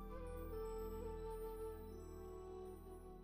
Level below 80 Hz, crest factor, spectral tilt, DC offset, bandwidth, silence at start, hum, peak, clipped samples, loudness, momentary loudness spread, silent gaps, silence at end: -54 dBFS; 12 dB; -7 dB/octave; under 0.1%; 15.5 kHz; 0 s; none; -38 dBFS; under 0.1%; -51 LUFS; 6 LU; none; 0 s